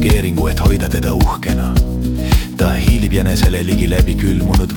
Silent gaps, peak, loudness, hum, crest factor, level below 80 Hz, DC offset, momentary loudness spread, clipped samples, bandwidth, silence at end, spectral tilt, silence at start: none; 0 dBFS; -15 LUFS; none; 12 dB; -18 dBFS; under 0.1%; 3 LU; under 0.1%; 19 kHz; 0 s; -6 dB/octave; 0 s